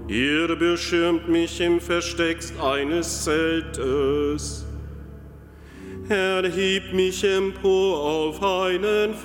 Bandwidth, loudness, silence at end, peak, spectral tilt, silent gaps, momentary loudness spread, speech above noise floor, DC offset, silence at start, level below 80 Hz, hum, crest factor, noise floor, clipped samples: 17 kHz; -22 LUFS; 0 s; -10 dBFS; -4 dB/octave; none; 12 LU; 21 dB; under 0.1%; 0 s; -40 dBFS; none; 14 dB; -43 dBFS; under 0.1%